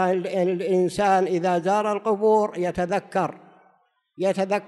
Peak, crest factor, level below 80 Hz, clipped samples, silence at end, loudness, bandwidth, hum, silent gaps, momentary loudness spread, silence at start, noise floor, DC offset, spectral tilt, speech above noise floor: -8 dBFS; 14 dB; -58 dBFS; under 0.1%; 0 s; -23 LUFS; 12 kHz; none; none; 6 LU; 0 s; -64 dBFS; under 0.1%; -6 dB/octave; 42 dB